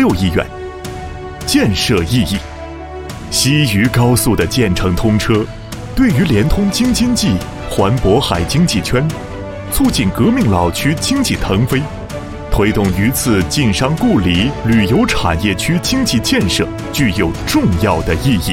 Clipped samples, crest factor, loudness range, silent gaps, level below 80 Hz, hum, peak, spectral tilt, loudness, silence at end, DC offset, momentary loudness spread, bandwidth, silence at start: under 0.1%; 14 dB; 2 LU; none; -26 dBFS; none; 0 dBFS; -5 dB/octave; -14 LUFS; 0 s; under 0.1%; 13 LU; 16.5 kHz; 0 s